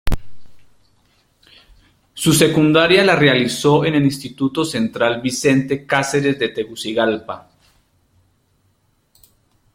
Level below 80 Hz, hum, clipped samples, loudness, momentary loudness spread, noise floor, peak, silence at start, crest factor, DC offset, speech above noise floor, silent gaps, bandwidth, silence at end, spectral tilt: -36 dBFS; none; under 0.1%; -16 LUFS; 12 LU; -62 dBFS; 0 dBFS; 0.05 s; 18 dB; under 0.1%; 46 dB; none; 16.5 kHz; 2.35 s; -4.5 dB/octave